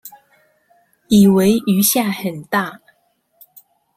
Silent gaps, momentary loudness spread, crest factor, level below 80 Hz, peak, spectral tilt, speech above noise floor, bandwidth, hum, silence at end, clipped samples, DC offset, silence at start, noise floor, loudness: none; 11 LU; 16 dB; -54 dBFS; -2 dBFS; -5 dB/octave; 48 dB; 16 kHz; none; 1.2 s; under 0.1%; under 0.1%; 0.05 s; -63 dBFS; -15 LUFS